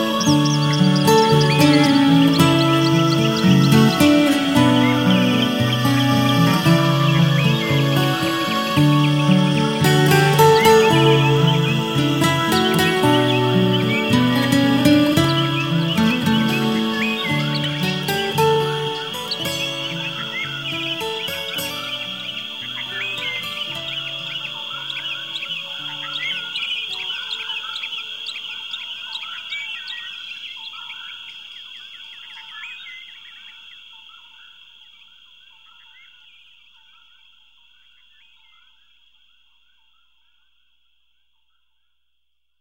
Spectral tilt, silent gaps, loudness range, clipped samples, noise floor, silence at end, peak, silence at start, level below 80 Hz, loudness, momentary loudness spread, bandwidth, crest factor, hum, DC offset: -5.5 dB/octave; none; 16 LU; under 0.1%; -76 dBFS; 8.8 s; -2 dBFS; 0 s; -54 dBFS; -18 LUFS; 17 LU; 16.5 kHz; 18 dB; none; 0.2%